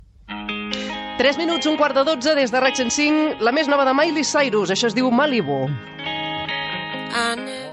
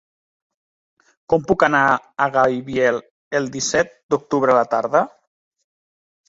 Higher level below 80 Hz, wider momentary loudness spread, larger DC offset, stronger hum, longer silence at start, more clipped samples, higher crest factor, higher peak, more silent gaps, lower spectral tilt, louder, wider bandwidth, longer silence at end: about the same, -56 dBFS vs -56 dBFS; about the same, 10 LU vs 8 LU; neither; neither; second, 0.25 s vs 1.3 s; neither; about the same, 16 dB vs 18 dB; about the same, -4 dBFS vs -2 dBFS; second, none vs 3.11-3.31 s, 4.03-4.09 s; about the same, -3.5 dB/octave vs -4 dB/octave; about the same, -20 LUFS vs -19 LUFS; first, 11.5 kHz vs 8 kHz; second, 0 s vs 1.2 s